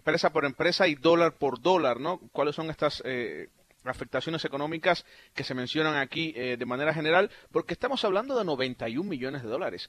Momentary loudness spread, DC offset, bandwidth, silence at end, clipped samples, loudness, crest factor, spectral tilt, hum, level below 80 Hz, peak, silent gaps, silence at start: 9 LU; under 0.1%; 13 kHz; 0 s; under 0.1%; -28 LUFS; 20 dB; -5.5 dB/octave; none; -62 dBFS; -8 dBFS; none; 0.05 s